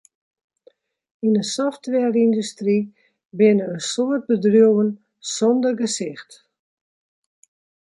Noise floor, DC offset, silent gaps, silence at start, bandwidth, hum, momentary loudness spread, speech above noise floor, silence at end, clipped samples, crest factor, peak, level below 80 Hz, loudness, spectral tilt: -57 dBFS; under 0.1%; 3.25-3.30 s; 1.25 s; 11.5 kHz; none; 13 LU; 38 dB; 1.7 s; under 0.1%; 18 dB; -4 dBFS; -72 dBFS; -20 LUFS; -5 dB/octave